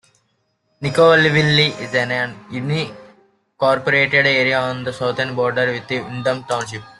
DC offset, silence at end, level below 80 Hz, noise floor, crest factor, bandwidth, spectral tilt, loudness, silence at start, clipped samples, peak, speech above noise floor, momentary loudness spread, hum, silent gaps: under 0.1%; 0.1 s; -56 dBFS; -67 dBFS; 18 dB; 12 kHz; -5 dB/octave; -17 LUFS; 0.8 s; under 0.1%; -2 dBFS; 49 dB; 11 LU; none; none